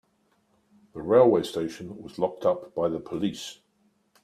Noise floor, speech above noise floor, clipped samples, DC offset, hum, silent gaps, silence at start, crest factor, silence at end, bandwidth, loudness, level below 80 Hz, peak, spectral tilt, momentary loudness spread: -69 dBFS; 43 dB; under 0.1%; under 0.1%; none; none; 0.95 s; 22 dB; 0.7 s; 14 kHz; -25 LUFS; -64 dBFS; -6 dBFS; -6 dB/octave; 20 LU